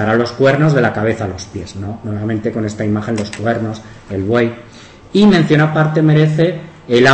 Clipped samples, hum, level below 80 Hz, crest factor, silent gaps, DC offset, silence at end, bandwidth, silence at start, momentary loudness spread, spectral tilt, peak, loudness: under 0.1%; none; -46 dBFS; 14 dB; none; under 0.1%; 0 s; 8.6 kHz; 0 s; 15 LU; -7 dB/octave; 0 dBFS; -15 LUFS